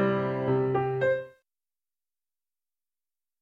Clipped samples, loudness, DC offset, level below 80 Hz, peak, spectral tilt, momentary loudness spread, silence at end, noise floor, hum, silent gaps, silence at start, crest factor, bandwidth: under 0.1%; -27 LUFS; under 0.1%; -64 dBFS; -14 dBFS; -9.5 dB/octave; 5 LU; 2.1 s; under -90 dBFS; none; none; 0 s; 16 dB; 5.2 kHz